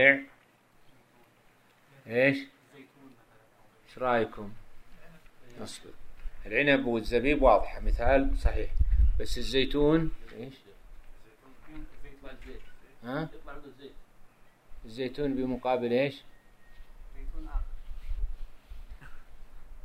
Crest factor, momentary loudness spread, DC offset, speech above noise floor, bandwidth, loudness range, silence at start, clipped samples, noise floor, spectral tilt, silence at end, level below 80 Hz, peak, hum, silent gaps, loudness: 24 dB; 25 LU; under 0.1%; 35 dB; 13.5 kHz; 17 LU; 0 s; under 0.1%; -62 dBFS; -6 dB/octave; 0.05 s; -36 dBFS; -6 dBFS; none; none; -29 LUFS